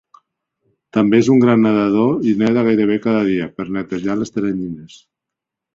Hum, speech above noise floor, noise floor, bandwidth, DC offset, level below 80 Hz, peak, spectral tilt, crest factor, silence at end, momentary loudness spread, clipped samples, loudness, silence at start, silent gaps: none; 68 dB; -83 dBFS; 7.6 kHz; under 0.1%; -54 dBFS; -2 dBFS; -7.5 dB/octave; 16 dB; 0.9 s; 11 LU; under 0.1%; -16 LUFS; 0.95 s; none